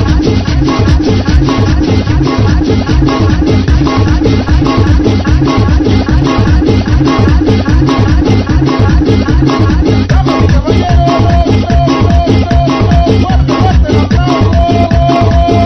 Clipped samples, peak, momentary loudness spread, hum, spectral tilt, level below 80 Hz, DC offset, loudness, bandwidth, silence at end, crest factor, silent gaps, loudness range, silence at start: 2%; 0 dBFS; 2 LU; none; -7.5 dB/octave; -12 dBFS; 0.8%; -9 LUFS; 6.4 kHz; 0 s; 8 dB; none; 1 LU; 0 s